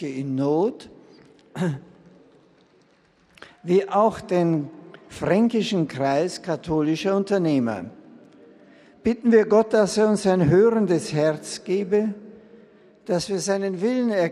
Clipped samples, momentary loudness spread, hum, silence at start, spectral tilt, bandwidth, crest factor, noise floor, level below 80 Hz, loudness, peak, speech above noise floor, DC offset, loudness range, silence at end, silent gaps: under 0.1%; 12 LU; none; 0 s; -6 dB/octave; 12.5 kHz; 18 dB; -59 dBFS; -58 dBFS; -22 LUFS; -6 dBFS; 38 dB; under 0.1%; 7 LU; 0 s; none